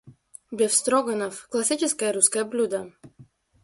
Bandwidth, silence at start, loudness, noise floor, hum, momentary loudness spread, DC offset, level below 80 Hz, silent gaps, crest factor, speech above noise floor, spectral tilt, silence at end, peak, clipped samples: 11.5 kHz; 0.05 s; -23 LUFS; -54 dBFS; none; 11 LU; under 0.1%; -70 dBFS; none; 22 dB; 30 dB; -2 dB/octave; 0.4 s; -2 dBFS; under 0.1%